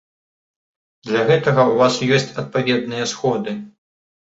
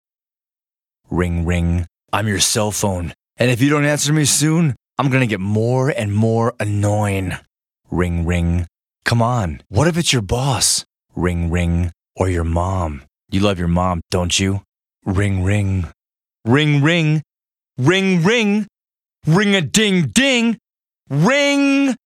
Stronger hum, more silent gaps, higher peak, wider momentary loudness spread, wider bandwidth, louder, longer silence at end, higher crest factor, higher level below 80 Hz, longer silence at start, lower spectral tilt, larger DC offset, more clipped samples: neither; second, none vs 14.68-14.73 s; about the same, -2 dBFS vs 0 dBFS; about the same, 10 LU vs 10 LU; second, 8 kHz vs 16 kHz; about the same, -18 LUFS vs -17 LUFS; first, 0.6 s vs 0.1 s; about the same, 16 dB vs 18 dB; second, -60 dBFS vs -36 dBFS; about the same, 1.05 s vs 1.1 s; about the same, -5 dB/octave vs -4.5 dB/octave; neither; neither